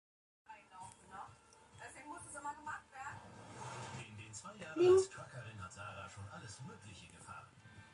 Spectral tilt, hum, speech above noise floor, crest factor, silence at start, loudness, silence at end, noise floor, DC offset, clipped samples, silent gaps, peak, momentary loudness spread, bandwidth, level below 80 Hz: -5 dB/octave; none; 26 dB; 22 dB; 0.5 s; -40 LUFS; 0 s; -63 dBFS; under 0.1%; under 0.1%; none; -20 dBFS; 22 LU; 11.5 kHz; -70 dBFS